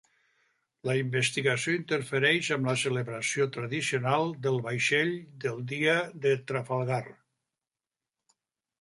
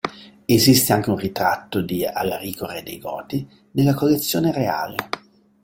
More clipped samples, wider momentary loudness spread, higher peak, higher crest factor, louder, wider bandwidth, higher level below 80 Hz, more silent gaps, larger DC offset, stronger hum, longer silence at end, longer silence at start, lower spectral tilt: neither; second, 7 LU vs 16 LU; second, -10 dBFS vs -2 dBFS; about the same, 20 dB vs 18 dB; second, -28 LUFS vs -21 LUFS; second, 11.5 kHz vs 17 kHz; second, -72 dBFS vs -54 dBFS; neither; neither; neither; first, 1.7 s vs 0.45 s; first, 0.85 s vs 0.05 s; about the same, -4.5 dB/octave vs -4.5 dB/octave